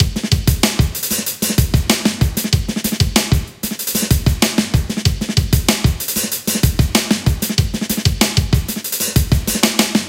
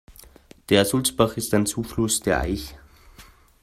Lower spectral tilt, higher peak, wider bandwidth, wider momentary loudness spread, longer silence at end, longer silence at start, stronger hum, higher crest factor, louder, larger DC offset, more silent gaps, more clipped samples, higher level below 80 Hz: about the same, -4 dB/octave vs -4 dB/octave; first, 0 dBFS vs -4 dBFS; about the same, 17 kHz vs 16 kHz; second, 4 LU vs 9 LU; second, 0 s vs 0.4 s; about the same, 0 s vs 0.1 s; neither; second, 16 dB vs 22 dB; first, -16 LUFS vs -22 LUFS; neither; neither; neither; first, -24 dBFS vs -42 dBFS